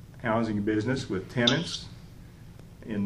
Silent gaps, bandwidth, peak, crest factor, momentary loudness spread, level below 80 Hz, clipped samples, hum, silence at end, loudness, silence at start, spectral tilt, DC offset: none; 12.5 kHz; -6 dBFS; 24 dB; 24 LU; -52 dBFS; under 0.1%; none; 0 s; -28 LUFS; 0 s; -5 dB/octave; under 0.1%